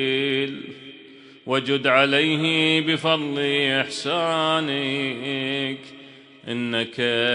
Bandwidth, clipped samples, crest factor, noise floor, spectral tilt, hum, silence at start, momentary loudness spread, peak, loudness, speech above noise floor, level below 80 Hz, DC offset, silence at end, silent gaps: 10.5 kHz; under 0.1%; 20 dB; -46 dBFS; -4.5 dB/octave; none; 0 s; 17 LU; -2 dBFS; -22 LUFS; 24 dB; -68 dBFS; under 0.1%; 0 s; none